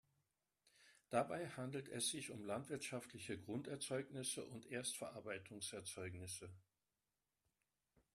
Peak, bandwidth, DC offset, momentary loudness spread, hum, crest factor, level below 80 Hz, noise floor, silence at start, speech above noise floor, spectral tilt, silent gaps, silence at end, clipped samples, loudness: -24 dBFS; 13.5 kHz; under 0.1%; 8 LU; none; 24 dB; -82 dBFS; under -90 dBFS; 0.8 s; over 42 dB; -3.5 dB/octave; none; 1.55 s; under 0.1%; -47 LUFS